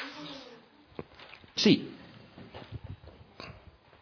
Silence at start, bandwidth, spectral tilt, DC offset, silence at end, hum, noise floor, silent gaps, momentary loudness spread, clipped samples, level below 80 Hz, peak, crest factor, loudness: 0 s; 5.4 kHz; -4 dB/octave; under 0.1%; 0.45 s; none; -56 dBFS; none; 25 LU; under 0.1%; -60 dBFS; -12 dBFS; 24 dB; -28 LUFS